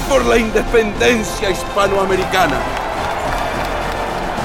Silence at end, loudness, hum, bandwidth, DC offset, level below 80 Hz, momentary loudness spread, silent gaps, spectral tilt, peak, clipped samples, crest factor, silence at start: 0 s; -16 LUFS; none; 18 kHz; under 0.1%; -28 dBFS; 7 LU; none; -4 dB/octave; -2 dBFS; under 0.1%; 14 dB; 0 s